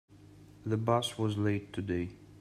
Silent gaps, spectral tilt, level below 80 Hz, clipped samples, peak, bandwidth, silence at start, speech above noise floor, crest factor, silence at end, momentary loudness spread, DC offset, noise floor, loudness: none; -6 dB/octave; -64 dBFS; under 0.1%; -14 dBFS; 13 kHz; 0.1 s; 23 dB; 20 dB; 0 s; 8 LU; under 0.1%; -55 dBFS; -33 LUFS